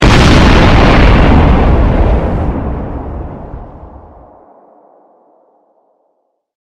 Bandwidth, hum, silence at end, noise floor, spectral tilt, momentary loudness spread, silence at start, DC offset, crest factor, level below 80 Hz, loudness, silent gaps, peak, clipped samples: 11 kHz; none; 2.75 s; -62 dBFS; -6.5 dB/octave; 19 LU; 0 s; under 0.1%; 10 dB; -14 dBFS; -9 LUFS; none; 0 dBFS; under 0.1%